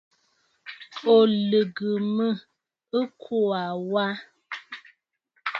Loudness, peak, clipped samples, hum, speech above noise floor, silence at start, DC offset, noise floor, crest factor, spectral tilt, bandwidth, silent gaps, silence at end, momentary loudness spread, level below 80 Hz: -24 LUFS; -8 dBFS; under 0.1%; none; 48 dB; 0.65 s; under 0.1%; -71 dBFS; 18 dB; -7.5 dB/octave; 6.6 kHz; none; 0 s; 22 LU; -76 dBFS